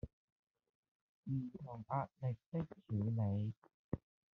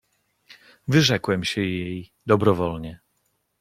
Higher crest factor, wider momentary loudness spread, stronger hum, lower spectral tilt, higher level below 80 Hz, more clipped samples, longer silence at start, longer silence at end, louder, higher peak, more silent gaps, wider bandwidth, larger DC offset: about the same, 18 dB vs 22 dB; second, 13 LU vs 16 LU; neither; first, -10.5 dB/octave vs -5.5 dB/octave; second, -68 dBFS vs -54 dBFS; neither; second, 0.05 s vs 0.85 s; second, 0.35 s vs 0.65 s; second, -43 LUFS vs -22 LUFS; second, -24 dBFS vs -2 dBFS; first, 0.13-0.47 s, 0.69-1.23 s, 2.46-2.52 s, 3.57-3.62 s, 3.74-3.91 s vs none; second, 3.8 kHz vs 16 kHz; neither